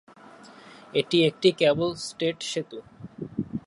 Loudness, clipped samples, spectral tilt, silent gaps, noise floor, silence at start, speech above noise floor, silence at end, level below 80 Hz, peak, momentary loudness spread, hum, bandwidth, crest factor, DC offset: -25 LUFS; under 0.1%; -5 dB/octave; none; -49 dBFS; 0.5 s; 24 dB; 0.05 s; -62 dBFS; -6 dBFS; 19 LU; none; 11.5 kHz; 20 dB; under 0.1%